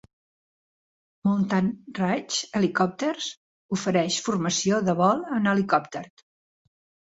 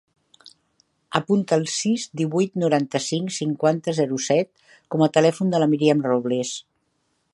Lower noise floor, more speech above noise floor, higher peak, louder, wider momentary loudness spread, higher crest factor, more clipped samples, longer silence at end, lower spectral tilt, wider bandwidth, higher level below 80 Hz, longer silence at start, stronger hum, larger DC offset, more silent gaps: first, under -90 dBFS vs -70 dBFS; first, over 66 dB vs 49 dB; second, -6 dBFS vs -2 dBFS; second, -25 LUFS vs -22 LUFS; about the same, 7 LU vs 7 LU; about the same, 20 dB vs 22 dB; neither; first, 1.05 s vs 0.75 s; about the same, -4.5 dB/octave vs -5.5 dB/octave; second, 8 kHz vs 11.5 kHz; first, -64 dBFS vs -70 dBFS; first, 1.25 s vs 0.45 s; neither; neither; first, 3.37-3.69 s vs none